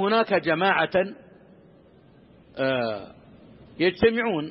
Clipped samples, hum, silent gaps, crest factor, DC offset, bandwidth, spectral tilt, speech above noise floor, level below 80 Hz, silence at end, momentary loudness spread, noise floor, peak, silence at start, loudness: under 0.1%; none; none; 18 dB; under 0.1%; 5.8 kHz; -9.5 dB/octave; 30 dB; -56 dBFS; 0 s; 10 LU; -54 dBFS; -8 dBFS; 0 s; -23 LUFS